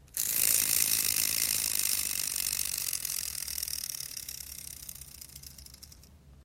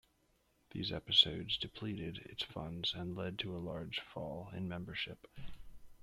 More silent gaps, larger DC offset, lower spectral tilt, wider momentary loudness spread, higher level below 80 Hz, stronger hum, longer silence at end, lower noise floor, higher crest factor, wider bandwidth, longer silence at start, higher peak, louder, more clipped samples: neither; neither; second, 1 dB/octave vs -5 dB/octave; first, 21 LU vs 16 LU; about the same, -58 dBFS vs -62 dBFS; neither; about the same, 0 s vs 0 s; second, -55 dBFS vs -75 dBFS; about the same, 28 dB vs 26 dB; first, 17 kHz vs 14.5 kHz; second, 0.15 s vs 0.7 s; first, -6 dBFS vs -14 dBFS; first, -28 LUFS vs -37 LUFS; neither